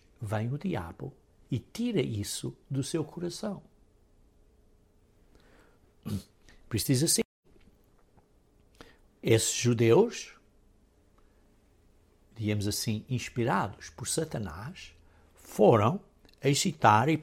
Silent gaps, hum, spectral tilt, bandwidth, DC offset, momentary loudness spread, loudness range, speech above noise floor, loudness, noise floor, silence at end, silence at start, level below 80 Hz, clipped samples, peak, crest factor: 7.25-7.43 s; none; -5 dB/octave; 16.5 kHz; under 0.1%; 18 LU; 10 LU; 35 dB; -29 LUFS; -64 dBFS; 0 s; 0.2 s; -60 dBFS; under 0.1%; -8 dBFS; 24 dB